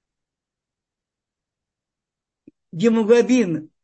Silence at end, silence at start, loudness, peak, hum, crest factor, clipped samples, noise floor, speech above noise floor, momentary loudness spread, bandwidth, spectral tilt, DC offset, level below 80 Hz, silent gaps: 0.2 s; 2.7 s; -18 LUFS; -4 dBFS; none; 20 dB; under 0.1%; -87 dBFS; 69 dB; 9 LU; 8.6 kHz; -6 dB/octave; under 0.1%; -72 dBFS; none